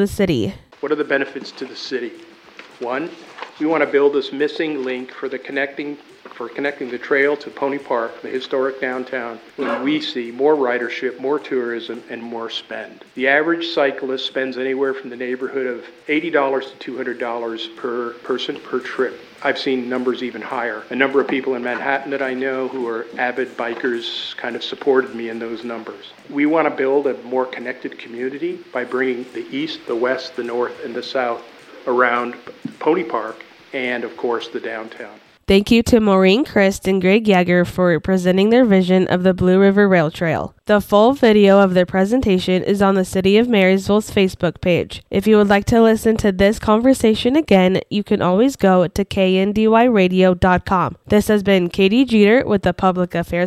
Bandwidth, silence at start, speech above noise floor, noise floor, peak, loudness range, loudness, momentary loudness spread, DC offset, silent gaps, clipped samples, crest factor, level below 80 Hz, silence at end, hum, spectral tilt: 14.5 kHz; 0 s; 25 dB; -42 dBFS; -2 dBFS; 8 LU; -18 LUFS; 14 LU; under 0.1%; none; under 0.1%; 16 dB; -44 dBFS; 0 s; none; -6 dB/octave